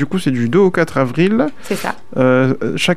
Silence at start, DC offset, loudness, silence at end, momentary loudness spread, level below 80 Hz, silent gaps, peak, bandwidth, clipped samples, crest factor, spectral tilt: 0 s; 4%; -15 LUFS; 0 s; 9 LU; -50 dBFS; none; -2 dBFS; 15 kHz; under 0.1%; 14 dB; -6 dB/octave